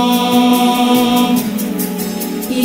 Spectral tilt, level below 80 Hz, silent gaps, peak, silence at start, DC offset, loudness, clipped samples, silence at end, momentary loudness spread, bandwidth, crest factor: -4 dB/octave; -54 dBFS; none; -2 dBFS; 0 s; under 0.1%; -14 LUFS; under 0.1%; 0 s; 8 LU; 16.5 kHz; 12 dB